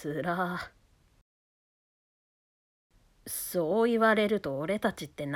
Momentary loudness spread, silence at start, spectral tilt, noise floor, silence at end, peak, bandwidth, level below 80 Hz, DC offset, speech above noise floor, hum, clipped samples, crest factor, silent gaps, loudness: 14 LU; 0 s; -5 dB/octave; under -90 dBFS; 0 s; -14 dBFS; 18 kHz; -64 dBFS; under 0.1%; over 61 dB; none; under 0.1%; 18 dB; 1.21-2.90 s; -29 LUFS